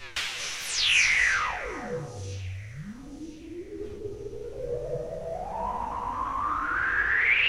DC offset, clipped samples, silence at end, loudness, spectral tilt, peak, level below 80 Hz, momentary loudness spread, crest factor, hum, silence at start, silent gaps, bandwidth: under 0.1%; under 0.1%; 0 s; -27 LUFS; -2 dB/octave; -10 dBFS; -48 dBFS; 20 LU; 18 dB; none; 0 s; none; 16 kHz